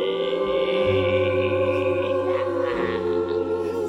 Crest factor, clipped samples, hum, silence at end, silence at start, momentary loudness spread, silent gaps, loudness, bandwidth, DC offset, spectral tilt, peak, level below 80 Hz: 12 dB; under 0.1%; none; 0 s; 0 s; 4 LU; none; -23 LUFS; 10 kHz; under 0.1%; -7 dB/octave; -10 dBFS; -54 dBFS